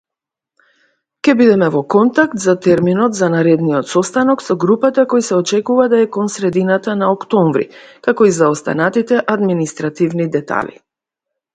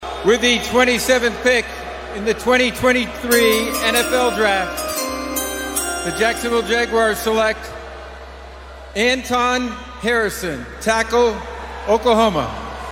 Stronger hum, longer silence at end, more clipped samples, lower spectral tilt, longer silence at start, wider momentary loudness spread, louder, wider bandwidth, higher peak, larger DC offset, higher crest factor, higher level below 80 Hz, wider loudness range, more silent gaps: neither; first, 0.85 s vs 0 s; neither; first, -6 dB/octave vs -3 dB/octave; first, 1.25 s vs 0 s; second, 7 LU vs 14 LU; first, -14 LUFS vs -18 LUFS; second, 9.4 kHz vs 16.5 kHz; about the same, 0 dBFS vs -2 dBFS; neither; about the same, 14 dB vs 18 dB; second, -58 dBFS vs -38 dBFS; about the same, 3 LU vs 4 LU; neither